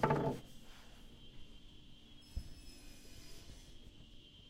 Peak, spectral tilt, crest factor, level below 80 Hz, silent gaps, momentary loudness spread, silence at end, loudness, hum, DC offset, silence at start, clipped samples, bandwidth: -18 dBFS; -6 dB/octave; 26 dB; -56 dBFS; none; 18 LU; 0 s; -45 LUFS; none; under 0.1%; 0 s; under 0.1%; 16 kHz